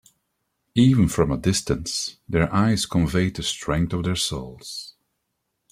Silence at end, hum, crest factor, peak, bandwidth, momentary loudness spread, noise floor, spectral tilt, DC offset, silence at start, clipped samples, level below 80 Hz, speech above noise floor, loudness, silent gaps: 0.8 s; none; 18 dB; -4 dBFS; 15.5 kHz; 15 LU; -77 dBFS; -5 dB/octave; under 0.1%; 0.75 s; under 0.1%; -42 dBFS; 55 dB; -22 LUFS; none